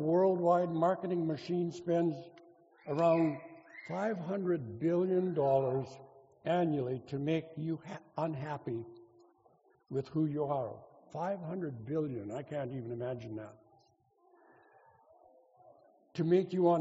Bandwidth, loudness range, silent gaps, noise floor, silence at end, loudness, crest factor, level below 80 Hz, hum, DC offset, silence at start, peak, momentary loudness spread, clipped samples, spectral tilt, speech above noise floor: 7.6 kHz; 9 LU; none; -70 dBFS; 0 s; -34 LUFS; 18 dB; -76 dBFS; none; under 0.1%; 0 s; -16 dBFS; 16 LU; under 0.1%; -7.5 dB/octave; 37 dB